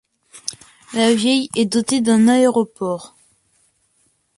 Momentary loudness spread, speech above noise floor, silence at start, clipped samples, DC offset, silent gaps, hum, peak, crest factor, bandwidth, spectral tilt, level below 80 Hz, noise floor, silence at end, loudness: 17 LU; 47 dB; 0.35 s; under 0.1%; under 0.1%; none; none; -2 dBFS; 18 dB; 11.5 kHz; -4 dB/octave; -62 dBFS; -63 dBFS; 1.3 s; -17 LUFS